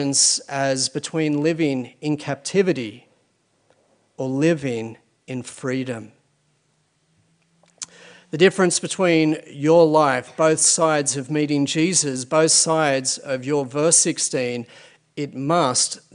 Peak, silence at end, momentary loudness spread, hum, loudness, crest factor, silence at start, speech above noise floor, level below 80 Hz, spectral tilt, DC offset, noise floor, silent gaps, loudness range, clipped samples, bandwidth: -2 dBFS; 0.15 s; 17 LU; none; -19 LUFS; 20 dB; 0 s; 46 dB; -68 dBFS; -3.5 dB/octave; under 0.1%; -66 dBFS; none; 9 LU; under 0.1%; 11 kHz